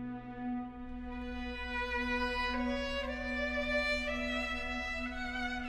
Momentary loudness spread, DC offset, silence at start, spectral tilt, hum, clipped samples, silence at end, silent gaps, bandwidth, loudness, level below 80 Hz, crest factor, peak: 9 LU; under 0.1%; 0 s; -4.5 dB/octave; none; under 0.1%; 0 s; none; 12.5 kHz; -36 LUFS; -46 dBFS; 16 dB; -22 dBFS